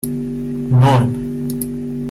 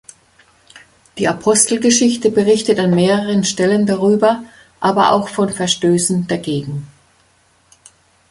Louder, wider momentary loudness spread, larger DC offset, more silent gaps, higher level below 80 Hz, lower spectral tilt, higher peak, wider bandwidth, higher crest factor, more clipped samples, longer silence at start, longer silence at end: second, -18 LUFS vs -15 LUFS; first, 11 LU vs 8 LU; neither; neither; first, -40 dBFS vs -54 dBFS; first, -7 dB/octave vs -4 dB/octave; about the same, -2 dBFS vs 0 dBFS; first, 15.5 kHz vs 11.5 kHz; about the same, 14 dB vs 16 dB; neither; second, 0.05 s vs 0.75 s; second, 0 s vs 1.45 s